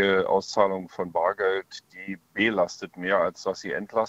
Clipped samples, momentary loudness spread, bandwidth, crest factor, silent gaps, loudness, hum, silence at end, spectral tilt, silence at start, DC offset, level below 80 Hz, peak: under 0.1%; 13 LU; 8.2 kHz; 20 dB; none; -26 LUFS; none; 0 s; -4.5 dB/octave; 0 s; under 0.1%; -64 dBFS; -6 dBFS